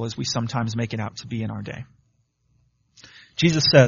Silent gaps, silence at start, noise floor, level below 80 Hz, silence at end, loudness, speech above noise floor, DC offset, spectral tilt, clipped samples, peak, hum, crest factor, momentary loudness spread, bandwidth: none; 0 s; -67 dBFS; -56 dBFS; 0 s; -24 LUFS; 46 dB; under 0.1%; -4.5 dB/octave; under 0.1%; 0 dBFS; none; 22 dB; 17 LU; 7.2 kHz